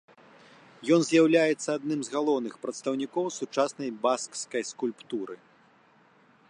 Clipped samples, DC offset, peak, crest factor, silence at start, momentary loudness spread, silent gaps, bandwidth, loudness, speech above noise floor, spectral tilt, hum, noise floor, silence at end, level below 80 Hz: under 0.1%; under 0.1%; -10 dBFS; 20 dB; 0.8 s; 14 LU; none; 10.5 kHz; -28 LUFS; 33 dB; -4.5 dB/octave; none; -61 dBFS; 1.15 s; -84 dBFS